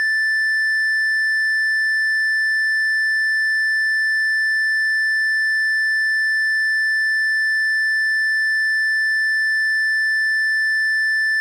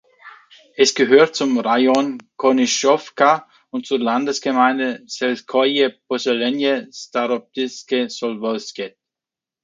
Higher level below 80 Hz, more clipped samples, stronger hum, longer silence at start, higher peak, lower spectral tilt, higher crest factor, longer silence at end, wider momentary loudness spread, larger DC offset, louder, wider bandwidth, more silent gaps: second, under -90 dBFS vs -70 dBFS; neither; neither; second, 0 s vs 0.25 s; second, -16 dBFS vs 0 dBFS; second, 12 dB/octave vs -3 dB/octave; second, 2 dB vs 18 dB; second, 0 s vs 0.75 s; second, 0 LU vs 10 LU; neither; about the same, -17 LUFS vs -18 LUFS; first, 16.5 kHz vs 9.4 kHz; neither